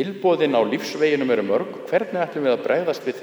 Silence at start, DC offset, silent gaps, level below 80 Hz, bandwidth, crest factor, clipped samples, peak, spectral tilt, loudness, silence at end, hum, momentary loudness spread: 0 s; under 0.1%; none; -76 dBFS; over 20 kHz; 16 dB; under 0.1%; -6 dBFS; -5.5 dB/octave; -21 LUFS; 0 s; none; 5 LU